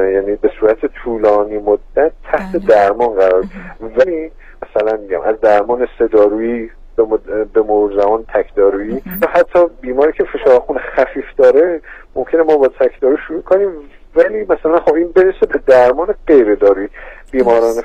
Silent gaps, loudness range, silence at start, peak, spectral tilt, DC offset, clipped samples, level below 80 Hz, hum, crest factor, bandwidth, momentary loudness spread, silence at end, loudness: none; 3 LU; 0 s; 0 dBFS; -6.5 dB/octave; 0.2%; under 0.1%; -36 dBFS; none; 12 dB; 16 kHz; 10 LU; 0 s; -13 LUFS